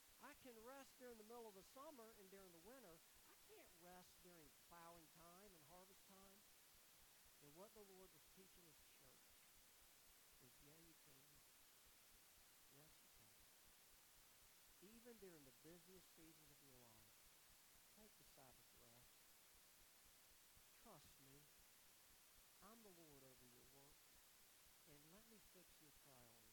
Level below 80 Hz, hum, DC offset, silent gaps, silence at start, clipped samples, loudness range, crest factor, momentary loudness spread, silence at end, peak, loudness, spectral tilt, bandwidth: -84 dBFS; none; under 0.1%; none; 0 s; under 0.1%; 4 LU; 20 dB; 6 LU; 0 s; -48 dBFS; -67 LUFS; -2.5 dB/octave; 19 kHz